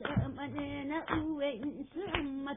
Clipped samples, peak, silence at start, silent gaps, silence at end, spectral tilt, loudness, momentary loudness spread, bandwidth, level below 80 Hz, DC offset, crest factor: under 0.1%; -16 dBFS; 0 s; none; 0 s; -4.5 dB/octave; -37 LUFS; 6 LU; 3.8 kHz; -52 dBFS; under 0.1%; 20 dB